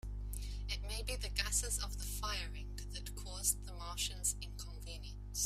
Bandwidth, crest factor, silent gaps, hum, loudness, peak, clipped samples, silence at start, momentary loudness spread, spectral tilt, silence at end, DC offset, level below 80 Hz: 16 kHz; 24 dB; none; 50 Hz at -45 dBFS; -40 LUFS; -18 dBFS; under 0.1%; 0.05 s; 12 LU; -1.5 dB/octave; 0 s; under 0.1%; -44 dBFS